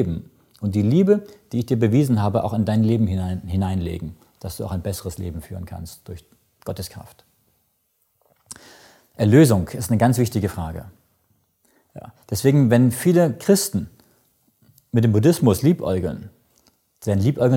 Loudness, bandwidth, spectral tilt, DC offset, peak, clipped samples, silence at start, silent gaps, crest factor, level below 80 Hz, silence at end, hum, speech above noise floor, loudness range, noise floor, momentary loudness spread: -20 LUFS; 17 kHz; -7 dB/octave; under 0.1%; -2 dBFS; under 0.1%; 0 s; none; 18 dB; -46 dBFS; 0 s; none; 49 dB; 13 LU; -68 dBFS; 20 LU